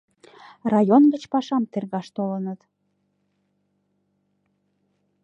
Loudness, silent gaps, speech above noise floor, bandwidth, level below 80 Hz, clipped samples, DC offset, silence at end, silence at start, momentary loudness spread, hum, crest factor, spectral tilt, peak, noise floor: -22 LUFS; none; 51 dB; 7.8 kHz; -74 dBFS; under 0.1%; under 0.1%; 2.7 s; 0.65 s; 15 LU; none; 20 dB; -8 dB/octave; -4 dBFS; -72 dBFS